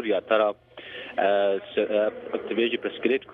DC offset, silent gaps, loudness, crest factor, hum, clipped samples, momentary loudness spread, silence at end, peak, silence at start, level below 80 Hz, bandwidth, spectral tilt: under 0.1%; none; -25 LUFS; 18 dB; none; under 0.1%; 11 LU; 0 s; -8 dBFS; 0 s; -68 dBFS; 4.6 kHz; -7 dB/octave